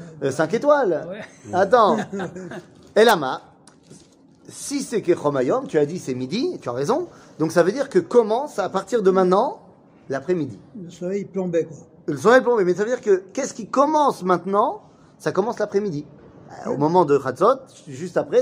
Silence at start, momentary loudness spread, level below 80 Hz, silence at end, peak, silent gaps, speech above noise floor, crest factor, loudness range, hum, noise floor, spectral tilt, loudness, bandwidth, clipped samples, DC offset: 0 s; 16 LU; -66 dBFS; 0 s; -2 dBFS; none; 31 dB; 18 dB; 4 LU; none; -51 dBFS; -5.5 dB/octave; -21 LUFS; 16 kHz; under 0.1%; under 0.1%